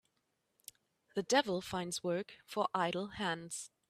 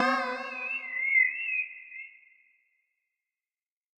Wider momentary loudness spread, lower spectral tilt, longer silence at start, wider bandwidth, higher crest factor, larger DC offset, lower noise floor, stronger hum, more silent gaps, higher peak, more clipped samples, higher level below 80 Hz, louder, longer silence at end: first, 23 LU vs 20 LU; first, -3.5 dB/octave vs -2 dB/octave; first, 1.15 s vs 0 s; first, 15.5 kHz vs 9.6 kHz; about the same, 22 dB vs 20 dB; neither; second, -82 dBFS vs under -90 dBFS; neither; neither; second, -16 dBFS vs -12 dBFS; neither; first, -72 dBFS vs under -90 dBFS; second, -37 LUFS vs -27 LUFS; second, 0.25 s vs 1.9 s